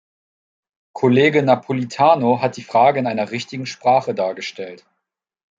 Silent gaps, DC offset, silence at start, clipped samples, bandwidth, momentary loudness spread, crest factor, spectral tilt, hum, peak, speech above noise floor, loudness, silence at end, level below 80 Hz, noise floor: none; under 0.1%; 0.95 s; under 0.1%; 7.8 kHz; 14 LU; 18 dB; -6 dB/octave; none; -2 dBFS; 62 dB; -18 LUFS; 0.85 s; -66 dBFS; -80 dBFS